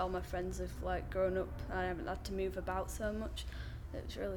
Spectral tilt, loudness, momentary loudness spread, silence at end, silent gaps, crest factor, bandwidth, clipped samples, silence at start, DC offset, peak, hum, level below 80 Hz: -5.5 dB/octave; -40 LUFS; 9 LU; 0 s; none; 16 dB; 19 kHz; under 0.1%; 0 s; under 0.1%; -24 dBFS; none; -46 dBFS